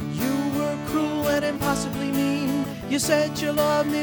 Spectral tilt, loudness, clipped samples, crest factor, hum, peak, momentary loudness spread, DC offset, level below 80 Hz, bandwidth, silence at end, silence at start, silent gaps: -4.5 dB/octave; -24 LUFS; under 0.1%; 16 dB; none; -8 dBFS; 4 LU; under 0.1%; -48 dBFS; over 20 kHz; 0 s; 0 s; none